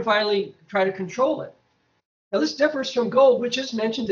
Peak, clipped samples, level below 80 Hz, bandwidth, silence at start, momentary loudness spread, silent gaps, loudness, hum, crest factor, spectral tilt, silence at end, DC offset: -6 dBFS; under 0.1%; -68 dBFS; 7.4 kHz; 0 s; 10 LU; 2.05-2.31 s; -22 LUFS; none; 18 dB; -4.5 dB/octave; 0 s; under 0.1%